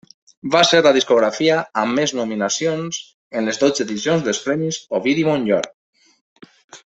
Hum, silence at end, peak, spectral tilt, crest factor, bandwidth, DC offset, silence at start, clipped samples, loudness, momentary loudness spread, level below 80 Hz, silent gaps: none; 0.1 s; -2 dBFS; -3.5 dB/octave; 18 dB; 8.2 kHz; under 0.1%; 0.45 s; under 0.1%; -18 LUFS; 11 LU; -62 dBFS; 3.14-3.31 s, 5.74-5.93 s, 6.21-6.36 s, 6.64-6.68 s